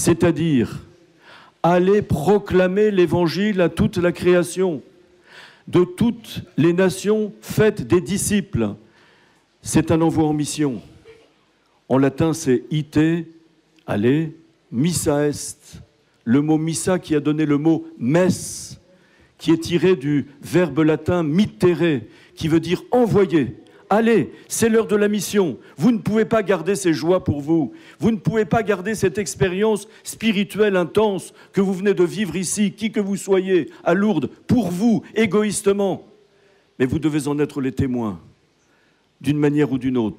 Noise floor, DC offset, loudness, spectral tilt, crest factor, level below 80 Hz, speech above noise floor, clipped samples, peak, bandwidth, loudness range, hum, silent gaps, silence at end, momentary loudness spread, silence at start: -60 dBFS; under 0.1%; -20 LUFS; -6 dB/octave; 14 dB; -50 dBFS; 41 dB; under 0.1%; -6 dBFS; 16 kHz; 3 LU; none; none; 0.05 s; 8 LU; 0 s